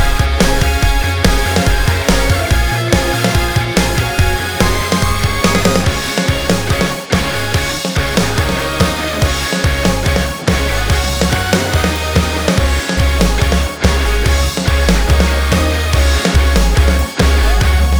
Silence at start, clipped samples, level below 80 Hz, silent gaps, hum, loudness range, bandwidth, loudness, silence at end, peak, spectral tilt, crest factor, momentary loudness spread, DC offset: 0 s; under 0.1%; -16 dBFS; none; none; 2 LU; over 20 kHz; -14 LUFS; 0 s; 0 dBFS; -4.5 dB/octave; 12 dB; 3 LU; 3%